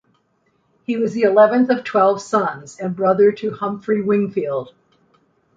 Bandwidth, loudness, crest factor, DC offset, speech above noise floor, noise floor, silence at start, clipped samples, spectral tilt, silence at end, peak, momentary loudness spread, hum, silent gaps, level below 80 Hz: 7.8 kHz; -18 LUFS; 16 dB; under 0.1%; 47 dB; -64 dBFS; 0.9 s; under 0.1%; -6.5 dB/octave; 0.85 s; -2 dBFS; 12 LU; none; none; -64 dBFS